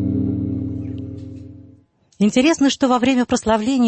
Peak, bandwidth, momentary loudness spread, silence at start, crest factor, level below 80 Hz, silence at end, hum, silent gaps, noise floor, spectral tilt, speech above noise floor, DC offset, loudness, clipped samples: -4 dBFS; 8.6 kHz; 17 LU; 0 s; 16 dB; -46 dBFS; 0 s; none; none; -52 dBFS; -5.5 dB/octave; 36 dB; under 0.1%; -18 LUFS; under 0.1%